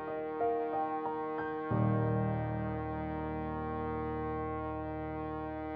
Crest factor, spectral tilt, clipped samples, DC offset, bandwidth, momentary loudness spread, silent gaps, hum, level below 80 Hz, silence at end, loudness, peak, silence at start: 16 dB; -8 dB/octave; under 0.1%; under 0.1%; 4.8 kHz; 7 LU; none; none; -50 dBFS; 0 s; -36 LUFS; -20 dBFS; 0 s